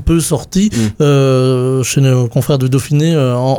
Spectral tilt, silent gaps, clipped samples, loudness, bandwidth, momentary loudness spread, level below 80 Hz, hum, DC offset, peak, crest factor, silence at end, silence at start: -6 dB/octave; none; under 0.1%; -12 LUFS; 17.5 kHz; 3 LU; -30 dBFS; none; under 0.1%; 0 dBFS; 10 dB; 0 s; 0 s